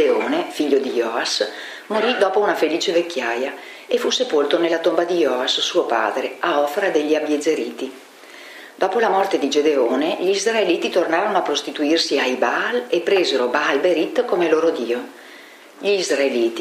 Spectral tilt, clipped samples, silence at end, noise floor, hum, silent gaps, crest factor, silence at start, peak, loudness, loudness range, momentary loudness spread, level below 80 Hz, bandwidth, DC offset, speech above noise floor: -2.5 dB/octave; under 0.1%; 0 s; -42 dBFS; none; none; 18 dB; 0 s; -2 dBFS; -19 LUFS; 2 LU; 8 LU; -76 dBFS; 15.5 kHz; under 0.1%; 23 dB